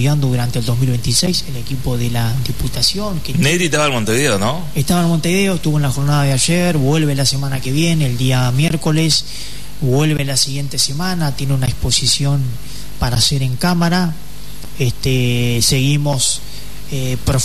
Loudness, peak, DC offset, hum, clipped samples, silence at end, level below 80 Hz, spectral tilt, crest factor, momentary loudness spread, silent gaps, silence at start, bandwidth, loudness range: -16 LUFS; -2 dBFS; 7%; none; under 0.1%; 0 s; -32 dBFS; -4.5 dB/octave; 14 dB; 9 LU; none; 0 s; 13.5 kHz; 2 LU